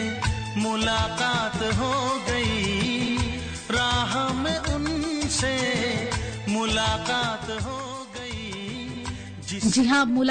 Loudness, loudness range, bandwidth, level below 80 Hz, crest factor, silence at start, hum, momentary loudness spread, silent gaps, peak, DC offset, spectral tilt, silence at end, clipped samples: -25 LUFS; 3 LU; 9.4 kHz; -40 dBFS; 14 dB; 0 s; none; 11 LU; none; -12 dBFS; under 0.1%; -4 dB/octave; 0 s; under 0.1%